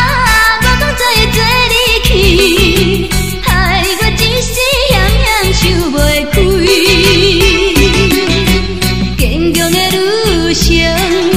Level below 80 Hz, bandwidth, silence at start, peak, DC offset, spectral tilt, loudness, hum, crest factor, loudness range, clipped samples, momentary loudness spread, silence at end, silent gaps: -16 dBFS; 16.5 kHz; 0 s; 0 dBFS; 4%; -4 dB/octave; -9 LUFS; none; 10 dB; 2 LU; 0.2%; 5 LU; 0 s; none